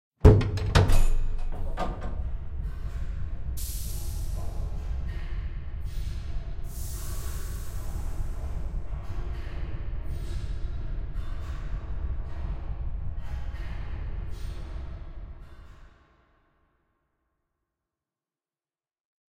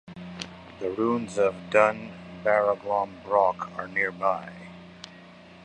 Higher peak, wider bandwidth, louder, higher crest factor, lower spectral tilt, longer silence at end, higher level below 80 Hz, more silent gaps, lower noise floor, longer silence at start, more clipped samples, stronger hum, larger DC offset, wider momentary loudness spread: about the same, -6 dBFS vs -4 dBFS; first, 16 kHz vs 9.8 kHz; second, -32 LUFS vs -26 LUFS; about the same, 22 dB vs 24 dB; about the same, -6.5 dB/octave vs -5.5 dB/octave; first, 3.4 s vs 0 s; first, -30 dBFS vs -62 dBFS; neither; first, under -90 dBFS vs -48 dBFS; first, 0.2 s vs 0.05 s; neither; neither; neither; second, 13 LU vs 21 LU